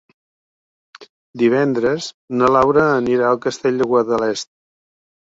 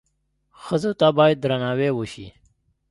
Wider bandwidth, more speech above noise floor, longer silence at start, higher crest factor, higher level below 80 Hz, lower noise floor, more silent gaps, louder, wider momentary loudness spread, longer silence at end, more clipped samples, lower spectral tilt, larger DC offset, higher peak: second, 7.8 kHz vs 11.5 kHz; first, over 74 dB vs 50 dB; first, 1 s vs 0.65 s; about the same, 16 dB vs 20 dB; about the same, -54 dBFS vs -56 dBFS; first, under -90 dBFS vs -70 dBFS; first, 1.09-1.34 s, 2.14-2.28 s vs none; first, -17 LUFS vs -21 LUFS; second, 10 LU vs 18 LU; first, 0.85 s vs 0.6 s; neither; about the same, -5.5 dB/octave vs -6.5 dB/octave; neither; about the same, -2 dBFS vs -2 dBFS